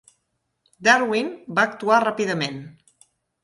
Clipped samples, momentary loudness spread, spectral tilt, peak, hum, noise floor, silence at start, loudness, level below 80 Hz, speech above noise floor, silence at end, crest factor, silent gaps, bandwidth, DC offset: under 0.1%; 9 LU; -4 dB/octave; -2 dBFS; none; -74 dBFS; 0.8 s; -21 LUFS; -68 dBFS; 53 dB; 0.7 s; 20 dB; none; 11.5 kHz; under 0.1%